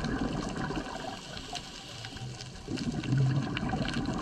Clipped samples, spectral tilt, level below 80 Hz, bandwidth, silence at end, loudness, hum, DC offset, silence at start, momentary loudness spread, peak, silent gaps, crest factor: under 0.1%; -5.5 dB/octave; -46 dBFS; 11 kHz; 0 s; -34 LUFS; none; under 0.1%; 0 s; 12 LU; -16 dBFS; none; 16 dB